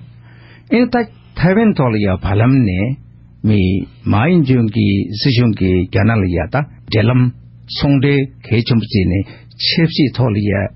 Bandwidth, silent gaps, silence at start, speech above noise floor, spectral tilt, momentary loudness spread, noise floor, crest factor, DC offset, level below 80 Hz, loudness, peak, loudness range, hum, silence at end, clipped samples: 5.8 kHz; none; 0 s; 27 dB; -6 dB/octave; 7 LU; -40 dBFS; 14 dB; under 0.1%; -36 dBFS; -15 LUFS; -2 dBFS; 1 LU; none; 0.1 s; under 0.1%